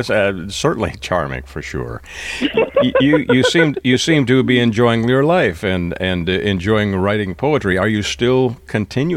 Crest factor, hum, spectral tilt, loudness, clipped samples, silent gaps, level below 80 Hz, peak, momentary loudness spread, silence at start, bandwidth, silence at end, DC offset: 16 dB; none; -5.5 dB/octave; -16 LUFS; under 0.1%; none; -40 dBFS; 0 dBFS; 10 LU; 0 s; 14.5 kHz; 0 s; under 0.1%